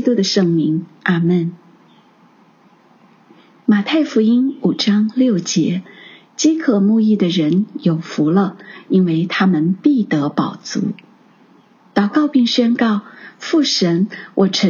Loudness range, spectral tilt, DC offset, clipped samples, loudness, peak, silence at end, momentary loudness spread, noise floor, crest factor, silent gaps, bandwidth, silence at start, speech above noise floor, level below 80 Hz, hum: 4 LU; -5.5 dB/octave; under 0.1%; under 0.1%; -16 LUFS; -2 dBFS; 0 s; 8 LU; -50 dBFS; 16 dB; none; 7.4 kHz; 0 s; 35 dB; -70 dBFS; none